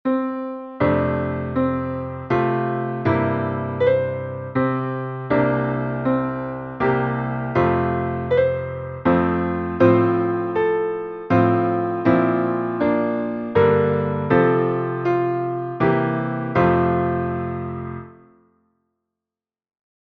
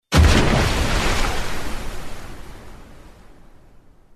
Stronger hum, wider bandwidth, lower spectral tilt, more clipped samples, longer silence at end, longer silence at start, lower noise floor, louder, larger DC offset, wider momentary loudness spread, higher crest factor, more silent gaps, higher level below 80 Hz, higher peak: neither; second, 5.2 kHz vs 13.5 kHz; first, -10 dB/octave vs -4.5 dB/octave; neither; first, 1.9 s vs 0.85 s; about the same, 0.05 s vs 0.1 s; first, -90 dBFS vs -47 dBFS; about the same, -21 LUFS vs -20 LUFS; neither; second, 9 LU vs 24 LU; about the same, 18 dB vs 18 dB; neither; second, -48 dBFS vs -24 dBFS; about the same, -2 dBFS vs -2 dBFS